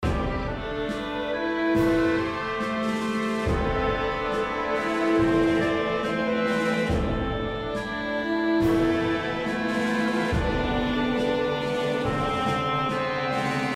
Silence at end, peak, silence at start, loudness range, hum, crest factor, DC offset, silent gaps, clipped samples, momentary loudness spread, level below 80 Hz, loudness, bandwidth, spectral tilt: 0 s; -10 dBFS; 0 s; 1 LU; none; 14 dB; under 0.1%; none; under 0.1%; 7 LU; -38 dBFS; -25 LUFS; 14 kHz; -6 dB/octave